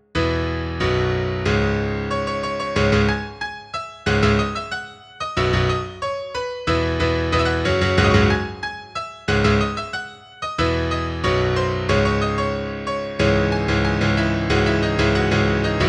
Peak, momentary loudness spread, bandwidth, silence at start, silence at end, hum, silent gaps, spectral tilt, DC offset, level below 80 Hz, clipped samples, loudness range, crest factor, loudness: -4 dBFS; 10 LU; 10 kHz; 0.15 s; 0 s; none; none; -6 dB/octave; under 0.1%; -32 dBFS; under 0.1%; 3 LU; 16 dB; -21 LUFS